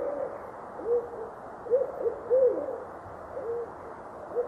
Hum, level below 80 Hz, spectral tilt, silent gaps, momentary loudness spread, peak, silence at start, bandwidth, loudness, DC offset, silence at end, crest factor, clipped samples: none; -62 dBFS; -7.5 dB/octave; none; 17 LU; -14 dBFS; 0 s; 2.9 kHz; -31 LUFS; under 0.1%; 0 s; 16 dB; under 0.1%